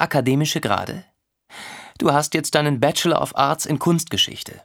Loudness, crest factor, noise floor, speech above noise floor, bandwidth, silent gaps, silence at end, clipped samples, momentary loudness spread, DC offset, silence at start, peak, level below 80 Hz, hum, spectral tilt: -20 LUFS; 20 dB; -47 dBFS; 27 dB; 19 kHz; none; 0.05 s; under 0.1%; 17 LU; under 0.1%; 0 s; 0 dBFS; -58 dBFS; none; -4 dB/octave